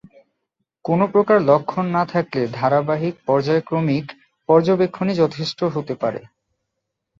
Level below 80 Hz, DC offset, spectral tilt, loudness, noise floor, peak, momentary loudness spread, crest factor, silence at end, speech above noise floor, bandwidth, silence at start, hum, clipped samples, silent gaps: -60 dBFS; under 0.1%; -7.5 dB/octave; -19 LUFS; -78 dBFS; -2 dBFS; 9 LU; 18 dB; 0.95 s; 60 dB; 7.6 kHz; 0.85 s; none; under 0.1%; none